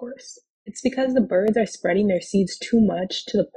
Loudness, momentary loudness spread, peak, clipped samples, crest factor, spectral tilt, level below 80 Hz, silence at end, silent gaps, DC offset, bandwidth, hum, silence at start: -22 LUFS; 19 LU; -8 dBFS; under 0.1%; 14 dB; -5.5 dB/octave; -56 dBFS; 0.1 s; 0.50-0.66 s; under 0.1%; 9.6 kHz; none; 0 s